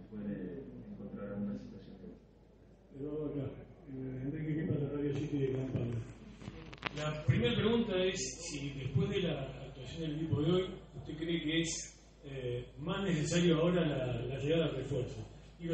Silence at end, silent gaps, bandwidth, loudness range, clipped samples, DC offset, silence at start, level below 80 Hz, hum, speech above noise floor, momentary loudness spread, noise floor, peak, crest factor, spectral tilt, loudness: 0 s; none; 8.4 kHz; 10 LU; under 0.1%; under 0.1%; 0 s; -56 dBFS; none; 27 dB; 17 LU; -60 dBFS; -16 dBFS; 20 dB; -5.5 dB/octave; -36 LUFS